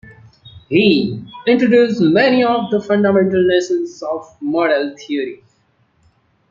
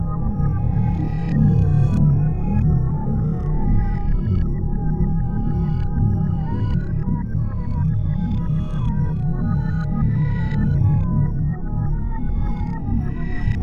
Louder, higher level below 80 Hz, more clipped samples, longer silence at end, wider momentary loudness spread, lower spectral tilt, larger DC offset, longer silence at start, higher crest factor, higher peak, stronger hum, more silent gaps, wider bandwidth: first, -15 LUFS vs -21 LUFS; second, -58 dBFS vs -24 dBFS; neither; first, 1.15 s vs 0 s; first, 11 LU vs 7 LU; second, -6.5 dB/octave vs -10.5 dB/octave; neither; about the same, 0.05 s vs 0 s; about the same, 16 dB vs 14 dB; first, 0 dBFS vs -4 dBFS; neither; neither; first, 7.6 kHz vs 4.6 kHz